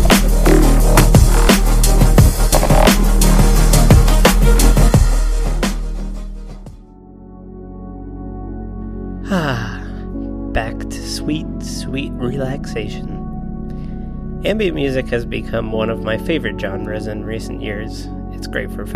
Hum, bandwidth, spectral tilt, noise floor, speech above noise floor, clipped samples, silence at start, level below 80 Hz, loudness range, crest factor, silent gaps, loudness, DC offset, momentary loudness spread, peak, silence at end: none; 15.5 kHz; -5 dB/octave; -38 dBFS; 18 dB; under 0.1%; 0 s; -16 dBFS; 13 LU; 14 dB; none; -16 LUFS; under 0.1%; 17 LU; 0 dBFS; 0 s